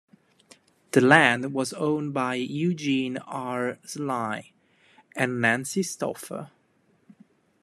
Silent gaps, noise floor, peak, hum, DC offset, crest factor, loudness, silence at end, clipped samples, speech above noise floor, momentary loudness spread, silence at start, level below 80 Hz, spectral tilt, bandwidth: none; -66 dBFS; 0 dBFS; none; under 0.1%; 26 dB; -25 LUFS; 1.15 s; under 0.1%; 41 dB; 15 LU; 0.95 s; -72 dBFS; -4.5 dB/octave; 14 kHz